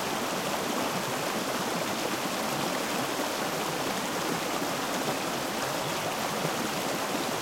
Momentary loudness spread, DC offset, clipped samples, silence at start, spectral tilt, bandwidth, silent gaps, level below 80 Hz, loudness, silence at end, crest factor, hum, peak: 1 LU; under 0.1%; under 0.1%; 0 s; -3 dB/octave; 16.5 kHz; none; -64 dBFS; -30 LUFS; 0 s; 14 dB; none; -16 dBFS